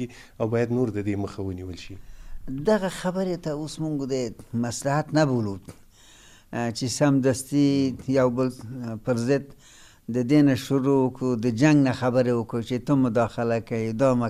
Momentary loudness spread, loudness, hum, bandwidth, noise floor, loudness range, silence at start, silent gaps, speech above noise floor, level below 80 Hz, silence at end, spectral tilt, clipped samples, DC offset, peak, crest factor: 12 LU; -24 LUFS; none; 14.5 kHz; -51 dBFS; 6 LU; 0 s; none; 27 dB; -50 dBFS; 0 s; -6.5 dB/octave; under 0.1%; under 0.1%; -8 dBFS; 18 dB